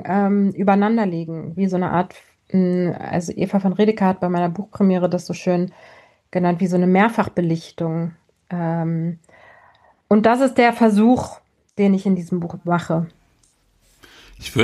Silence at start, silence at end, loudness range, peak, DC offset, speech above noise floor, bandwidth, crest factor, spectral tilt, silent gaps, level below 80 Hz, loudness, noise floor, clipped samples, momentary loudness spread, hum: 0 s; 0 s; 4 LU; -2 dBFS; under 0.1%; 42 dB; 12 kHz; 18 dB; -7.5 dB/octave; none; -56 dBFS; -19 LUFS; -60 dBFS; under 0.1%; 12 LU; none